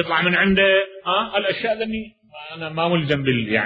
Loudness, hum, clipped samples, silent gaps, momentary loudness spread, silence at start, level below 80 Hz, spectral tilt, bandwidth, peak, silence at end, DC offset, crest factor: -19 LUFS; none; under 0.1%; none; 16 LU; 0 s; -48 dBFS; -7.5 dB/octave; 6 kHz; -4 dBFS; 0 s; under 0.1%; 16 dB